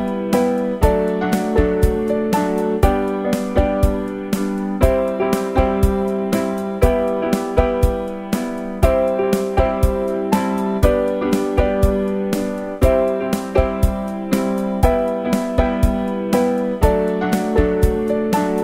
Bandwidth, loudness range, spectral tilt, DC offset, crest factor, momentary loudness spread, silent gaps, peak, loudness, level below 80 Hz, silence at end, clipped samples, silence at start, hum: 16.5 kHz; 1 LU; -7 dB/octave; under 0.1%; 18 dB; 4 LU; none; 0 dBFS; -19 LUFS; -24 dBFS; 0 s; under 0.1%; 0 s; none